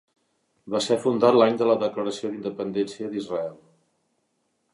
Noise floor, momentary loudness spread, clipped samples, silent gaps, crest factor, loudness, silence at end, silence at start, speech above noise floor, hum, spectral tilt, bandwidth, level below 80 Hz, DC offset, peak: -73 dBFS; 12 LU; under 0.1%; none; 20 dB; -24 LUFS; 1.2 s; 0.65 s; 50 dB; none; -5.5 dB/octave; 11.5 kHz; -72 dBFS; under 0.1%; -6 dBFS